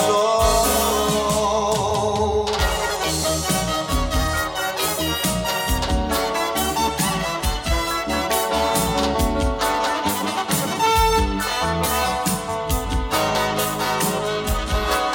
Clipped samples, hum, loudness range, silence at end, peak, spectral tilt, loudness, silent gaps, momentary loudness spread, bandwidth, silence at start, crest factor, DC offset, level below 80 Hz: under 0.1%; none; 2 LU; 0 s; -6 dBFS; -3.5 dB/octave; -20 LUFS; none; 5 LU; 17.5 kHz; 0 s; 14 dB; under 0.1%; -30 dBFS